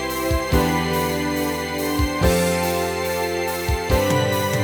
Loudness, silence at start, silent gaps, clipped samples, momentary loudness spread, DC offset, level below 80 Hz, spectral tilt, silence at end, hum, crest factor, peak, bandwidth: -21 LUFS; 0 s; none; under 0.1%; 4 LU; under 0.1%; -30 dBFS; -5 dB/octave; 0 s; none; 18 dB; -4 dBFS; over 20 kHz